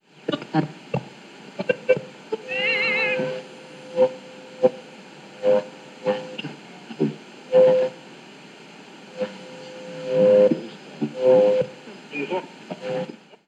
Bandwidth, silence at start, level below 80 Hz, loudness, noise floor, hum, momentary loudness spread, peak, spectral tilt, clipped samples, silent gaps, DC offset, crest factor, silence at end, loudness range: 8.6 kHz; 0.3 s; -78 dBFS; -23 LUFS; -44 dBFS; none; 25 LU; -4 dBFS; -6 dB/octave; under 0.1%; none; under 0.1%; 20 dB; 0.3 s; 4 LU